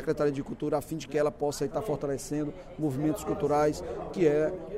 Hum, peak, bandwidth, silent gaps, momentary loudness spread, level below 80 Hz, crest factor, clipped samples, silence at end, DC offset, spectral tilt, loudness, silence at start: none; -14 dBFS; 16 kHz; none; 8 LU; -52 dBFS; 16 dB; under 0.1%; 0 s; under 0.1%; -6.5 dB/octave; -30 LUFS; 0 s